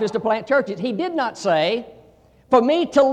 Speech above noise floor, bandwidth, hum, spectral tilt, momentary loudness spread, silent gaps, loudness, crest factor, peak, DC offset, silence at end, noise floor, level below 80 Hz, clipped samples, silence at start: 33 dB; 9.6 kHz; none; -5 dB/octave; 7 LU; none; -20 LUFS; 16 dB; -4 dBFS; under 0.1%; 0 s; -52 dBFS; -60 dBFS; under 0.1%; 0 s